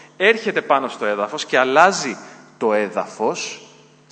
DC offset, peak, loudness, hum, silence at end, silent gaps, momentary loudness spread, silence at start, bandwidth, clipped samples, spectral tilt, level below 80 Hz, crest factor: under 0.1%; 0 dBFS; -19 LUFS; none; 0.5 s; none; 13 LU; 0.2 s; 9.2 kHz; under 0.1%; -3 dB/octave; -74 dBFS; 20 dB